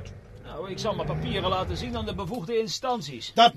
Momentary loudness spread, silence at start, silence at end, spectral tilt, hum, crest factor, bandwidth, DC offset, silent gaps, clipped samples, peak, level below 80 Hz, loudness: 11 LU; 0 s; 0 s; -4.5 dB/octave; none; 22 dB; 14 kHz; under 0.1%; none; under 0.1%; -6 dBFS; -46 dBFS; -29 LUFS